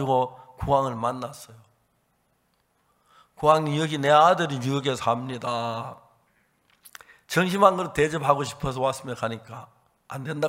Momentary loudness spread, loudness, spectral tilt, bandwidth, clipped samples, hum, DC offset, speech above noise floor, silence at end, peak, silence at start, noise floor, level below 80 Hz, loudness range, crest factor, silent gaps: 17 LU; -24 LUFS; -5.5 dB/octave; 16 kHz; under 0.1%; none; under 0.1%; 46 dB; 0 s; -2 dBFS; 0 s; -69 dBFS; -54 dBFS; 6 LU; 24 dB; none